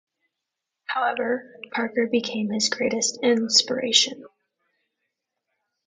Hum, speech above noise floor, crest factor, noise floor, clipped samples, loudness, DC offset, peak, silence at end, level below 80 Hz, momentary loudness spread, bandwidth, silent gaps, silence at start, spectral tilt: none; 60 dB; 24 dB; -84 dBFS; under 0.1%; -22 LUFS; under 0.1%; -2 dBFS; 1.6 s; -74 dBFS; 11 LU; 9.6 kHz; none; 0.9 s; -2 dB/octave